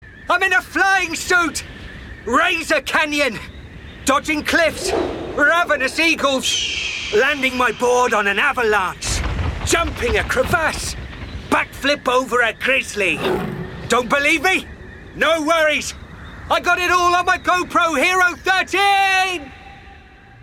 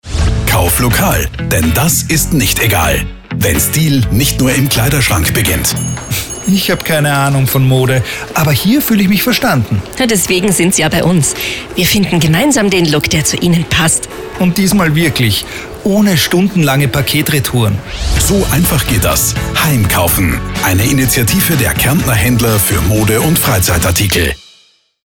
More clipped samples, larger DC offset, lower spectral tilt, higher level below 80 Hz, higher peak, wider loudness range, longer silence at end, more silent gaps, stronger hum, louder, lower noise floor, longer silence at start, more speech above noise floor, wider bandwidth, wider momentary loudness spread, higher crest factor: neither; neither; about the same, -3 dB/octave vs -4 dB/octave; second, -38 dBFS vs -24 dBFS; about the same, -2 dBFS vs -2 dBFS; about the same, 3 LU vs 1 LU; second, 0.45 s vs 0.7 s; neither; neither; second, -17 LUFS vs -11 LUFS; second, -43 dBFS vs -49 dBFS; about the same, 0 s vs 0.05 s; second, 25 dB vs 38 dB; about the same, 17.5 kHz vs 19 kHz; first, 13 LU vs 5 LU; first, 16 dB vs 10 dB